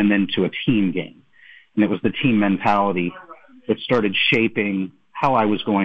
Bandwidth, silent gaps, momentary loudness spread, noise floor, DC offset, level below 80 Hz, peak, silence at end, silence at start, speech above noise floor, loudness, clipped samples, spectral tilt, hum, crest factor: 6.4 kHz; none; 11 LU; -49 dBFS; under 0.1%; -56 dBFS; -6 dBFS; 0 s; 0 s; 30 dB; -20 LUFS; under 0.1%; -7.5 dB/octave; none; 14 dB